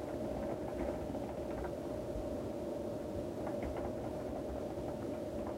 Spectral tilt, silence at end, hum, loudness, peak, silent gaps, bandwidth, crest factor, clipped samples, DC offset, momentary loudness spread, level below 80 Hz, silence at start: -7.5 dB/octave; 0 s; none; -41 LUFS; -26 dBFS; none; 16 kHz; 16 dB; under 0.1%; under 0.1%; 2 LU; -52 dBFS; 0 s